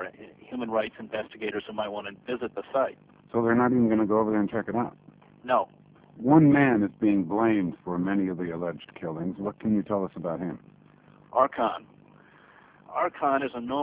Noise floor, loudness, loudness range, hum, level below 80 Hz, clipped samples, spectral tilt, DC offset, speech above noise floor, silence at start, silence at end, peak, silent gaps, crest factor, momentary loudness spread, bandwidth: -55 dBFS; -27 LUFS; 7 LU; none; -62 dBFS; under 0.1%; -6.5 dB/octave; under 0.1%; 29 dB; 0 s; 0 s; -8 dBFS; none; 20 dB; 14 LU; 4 kHz